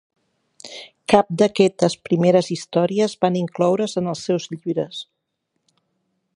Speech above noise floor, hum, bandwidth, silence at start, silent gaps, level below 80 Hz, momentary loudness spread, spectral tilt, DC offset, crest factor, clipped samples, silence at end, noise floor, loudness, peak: 56 dB; none; 11 kHz; 0.65 s; none; -62 dBFS; 16 LU; -6 dB/octave; under 0.1%; 20 dB; under 0.1%; 1.3 s; -75 dBFS; -20 LUFS; 0 dBFS